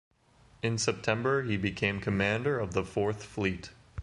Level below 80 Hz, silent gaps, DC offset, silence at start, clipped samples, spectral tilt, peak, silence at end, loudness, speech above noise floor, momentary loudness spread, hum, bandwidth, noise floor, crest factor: -52 dBFS; none; under 0.1%; 0.65 s; under 0.1%; -5 dB/octave; -12 dBFS; 0 s; -30 LUFS; 31 dB; 5 LU; none; 11.5 kHz; -61 dBFS; 18 dB